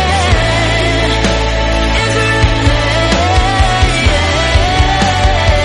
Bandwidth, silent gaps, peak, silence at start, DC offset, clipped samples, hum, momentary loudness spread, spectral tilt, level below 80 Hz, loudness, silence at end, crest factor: 11.5 kHz; none; 0 dBFS; 0 s; under 0.1%; under 0.1%; none; 2 LU; -4.5 dB/octave; -16 dBFS; -11 LUFS; 0 s; 10 dB